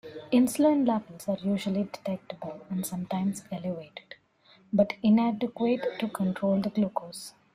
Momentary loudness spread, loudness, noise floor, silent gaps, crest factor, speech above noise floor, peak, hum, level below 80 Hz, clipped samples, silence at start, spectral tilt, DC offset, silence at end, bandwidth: 14 LU; -28 LUFS; -61 dBFS; none; 18 dB; 33 dB; -12 dBFS; none; -68 dBFS; under 0.1%; 0.05 s; -6.5 dB/octave; under 0.1%; 0.25 s; 15.5 kHz